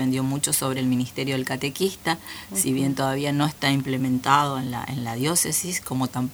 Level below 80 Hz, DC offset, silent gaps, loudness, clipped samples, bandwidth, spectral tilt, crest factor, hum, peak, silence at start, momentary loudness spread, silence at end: -56 dBFS; under 0.1%; none; -24 LUFS; under 0.1%; over 20 kHz; -4 dB/octave; 20 dB; none; -4 dBFS; 0 s; 7 LU; 0 s